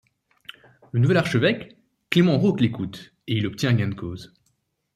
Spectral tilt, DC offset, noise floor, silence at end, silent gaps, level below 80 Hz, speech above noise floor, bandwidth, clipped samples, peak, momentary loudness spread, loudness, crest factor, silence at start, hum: -7 dB/octave; under 0.1%; -71 dBFS; 0.7 s; none; -58 dBFS; 49 dB; 13.5 kHz; under 0.1%; -2 dBFS; 21 LU; -22 LUFS; 20 dB; 0.95 s; none